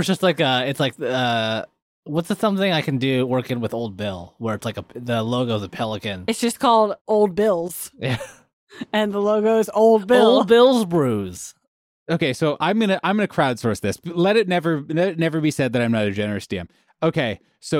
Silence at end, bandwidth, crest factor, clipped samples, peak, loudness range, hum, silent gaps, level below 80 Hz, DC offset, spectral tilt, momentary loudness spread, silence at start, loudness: 0 s; 16.5 kHz; 16 dB; under 0.1%; -4 dBFS; 6 LU; none; 1.82-2.03 s, 7.01-7.05 s, 8.53-8.67 s, 11.68-12.06 s; -58 dBFS; under 0.1%; -5.5 dB/octave; 12 LU; 0 s; -20 LUFS